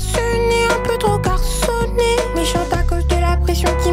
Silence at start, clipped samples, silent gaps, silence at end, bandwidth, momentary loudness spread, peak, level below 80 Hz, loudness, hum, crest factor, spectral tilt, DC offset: 0 s; under 0.1%; none; 0 s; 16 kHz; 3 LU; -4 dBFS; -20 dBFS; -17 LUFS; none; 12 dB; -5 dB/octave; under 0.1%